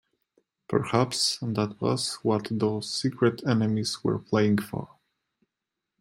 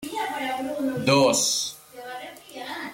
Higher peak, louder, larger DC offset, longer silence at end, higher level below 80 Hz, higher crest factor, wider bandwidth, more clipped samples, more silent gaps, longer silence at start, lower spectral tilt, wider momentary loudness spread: about the same, -8 dBFS vs -8 dBFS; second, -27 LUFS vs -23 LUFS; neither; first, 1.15 s vs 0 s; about the same, -64 dBFS vs -66 dBFS; about the same, 20 dB vs 18 dB; about the same, 15 kHz vs 16.5 kHz; neither; neither; first, 0.7 s vs 0 s; first, -5 dB/octave vs -3 dB/octave; second, 5 LU vs 19 LU